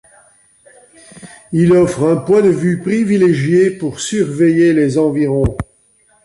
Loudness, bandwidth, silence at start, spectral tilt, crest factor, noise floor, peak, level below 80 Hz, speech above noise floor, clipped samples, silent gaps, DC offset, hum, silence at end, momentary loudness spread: -13 LUFS; 11.5 kHz; 1.15 s; -7 dB/octave; 12 dB; -54 dBFS; -2 dBFS; -38 dBFS; 41 dB; under 0.1%; none; under 0.1%; none; 0.6 s; 8 LU